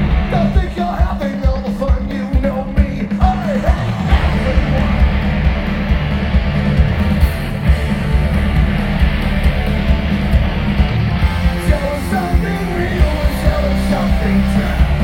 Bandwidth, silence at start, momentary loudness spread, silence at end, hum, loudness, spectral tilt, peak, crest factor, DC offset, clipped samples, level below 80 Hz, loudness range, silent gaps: 16 kHz; 0 s; 3 LU; 0 s; none; -16 LUFS; -7.5 dB/octave; 0 dBFS; 14 dB; under 0.1%; under 0.1%; -16 dBFS; 1 LU; none